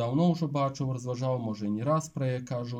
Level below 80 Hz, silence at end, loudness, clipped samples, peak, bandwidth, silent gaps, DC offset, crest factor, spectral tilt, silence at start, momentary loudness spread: -66 dBFS; 0 s; -30 LUFS; under 0.1%; -14 dBFS; 10.5 kHz; none; under 0.1%; 14 dB; -7.5 dB/octave; 0 s; 6 LU